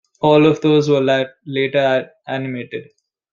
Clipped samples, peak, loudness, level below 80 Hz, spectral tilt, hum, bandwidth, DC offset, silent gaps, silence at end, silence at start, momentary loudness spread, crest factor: under 0.1%; -2 dBFS; -16 LUFS; -60 dBFS; -6.5 dB/octave; none; 7.2 kHz; under 0.1%; none; 0.5 s; 0.2 s; 14 LU; 16 dB